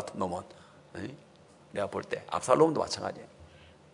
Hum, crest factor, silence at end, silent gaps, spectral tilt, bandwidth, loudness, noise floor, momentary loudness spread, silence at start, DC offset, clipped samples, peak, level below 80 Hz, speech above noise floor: none; 24 dB; 0.35 s; none; -5 dB/octave; 11 kHz; -31 LUFS; -55 dBFS; 23 LU; 0 s; under 0.1%; under 0.1%; -8 dBFS; -70 dBFS; 24 dB